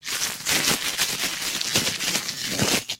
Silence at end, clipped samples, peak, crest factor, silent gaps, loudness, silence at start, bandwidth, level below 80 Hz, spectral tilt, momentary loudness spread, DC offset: 0.05 s; under 0.1%; -4 dBFS; 22 dB; none; -23 LUFS; 0.05 s; 16.5 kHz; -54 dBFS; -1 dB/octave; 5 LU; under 0.1%